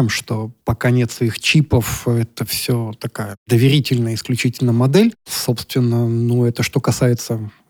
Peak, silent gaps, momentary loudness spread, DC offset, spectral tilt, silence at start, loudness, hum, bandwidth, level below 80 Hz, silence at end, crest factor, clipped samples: -2 dBFS; 3.37-3.46 s; 9 LU; under 0.1%; -5.5 dB/octave; 0 s; -18 LUFS; none; 19.5 kHz; -44 dBFS; 0.2 s; 16 dB; under 0.1%